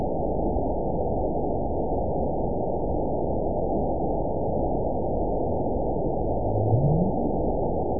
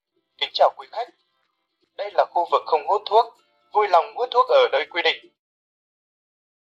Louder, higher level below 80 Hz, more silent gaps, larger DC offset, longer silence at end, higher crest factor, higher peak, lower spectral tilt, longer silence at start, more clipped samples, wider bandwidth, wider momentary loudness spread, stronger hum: second, -26 LUFS vs -21 LUFS; first, -34 dBFS vs -80 dBFS; neither; first, 3% vs under 0.1%; second, 0 s vs 1.5 s; about the same, 14 dB vs 18 dB; second, -10 dBFS vs -6 dBFS; first, -18.5 dB/octave vs -1.5 dB/octave; second, 0 s vs 0.4 s; neither; second, 1 kHz vs 7.6 kHz; second, 4 LU vs 14 LU; neither